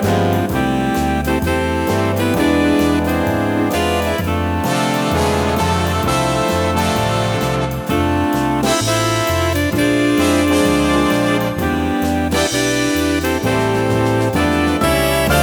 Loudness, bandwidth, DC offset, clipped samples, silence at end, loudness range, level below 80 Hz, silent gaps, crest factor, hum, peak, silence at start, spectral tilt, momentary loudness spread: -16 LUFS; over 20 kHz; under 0.1%; under 0.1%; 0 s; 2 LU; -32 dBFS; none; 14 dB; none; -2 dBFS; 0 s; -5 dB/octave; 3 LU